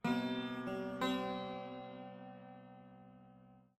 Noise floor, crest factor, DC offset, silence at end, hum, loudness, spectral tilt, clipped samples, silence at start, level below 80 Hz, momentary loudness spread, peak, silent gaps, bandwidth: -63 dBFS; 20 dB; under 0.1%; 0.2 s; none; -41 LUFS; -6 dB/octave; under 0.1%; 0.05 s; -74 dBFS; 22 LU; -22 dBFS; none; 16 kHz